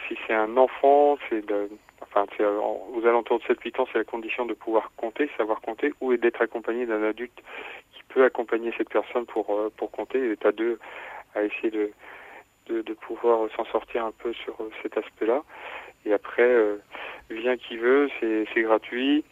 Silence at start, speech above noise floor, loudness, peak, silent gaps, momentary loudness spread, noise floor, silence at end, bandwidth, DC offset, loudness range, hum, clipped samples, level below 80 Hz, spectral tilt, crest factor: 0 s; 23 dB; -26 LUFS; -6 dBFS; none; 14 LU; -48 dBFS; 0.1 s; 7.4 kHz; under 0.1%; 5 LU; none; under 0.1%; -66 dBFS; -5.5 dB/octave; 20 dB